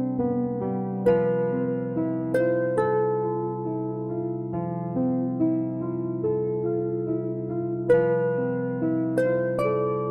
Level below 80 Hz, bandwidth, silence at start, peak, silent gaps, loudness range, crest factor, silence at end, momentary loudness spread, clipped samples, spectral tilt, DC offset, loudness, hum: -60 dBFS; 11.5 kHz; 0 s; -8 dBFS; none; 2 LU; 16 dB; 0 s; 7 LU; under 0.1%; -10 dB/octave; under 0.1%; -26 LUFS; none